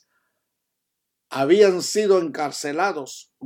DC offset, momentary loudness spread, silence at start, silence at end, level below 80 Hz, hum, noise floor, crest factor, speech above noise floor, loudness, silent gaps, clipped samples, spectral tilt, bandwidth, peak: under 0.1%; 16 LU; 1.3 s; 0 s; -82 dBFS; none; -80 dBFS; 20 dB; 59 dB; -20 LUFS; none; under 0.1%; -4 dB/octave; 16 kHz; -4 dBFS